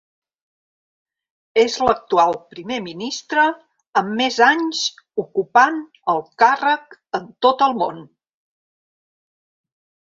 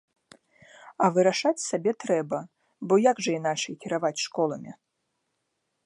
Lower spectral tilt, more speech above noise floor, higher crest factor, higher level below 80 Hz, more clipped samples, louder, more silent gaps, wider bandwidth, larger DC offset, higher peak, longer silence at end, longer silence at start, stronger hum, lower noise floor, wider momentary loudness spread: second, -3 dB/octave vs -4.5 dB/octave; first, over 72 dB vs 53 dB; about the same, 20 dB vs 20 dB; first, -58 dBFS vs -80 dBFS; neither; first, -19 LUFS vs -26 LUFS; first, 3.88-3.93 s vs none; second, 7.8 kHz vs 11.5 kHz; neither; first, 0 dBFS vs -8 dBFS; first, 2.05 s vs 1.15 s; first, 1.55 s vs 0.8 s; neither; first, under -90 dBFS vs -78 dBFS; about the same, 13 LU vs 12 LU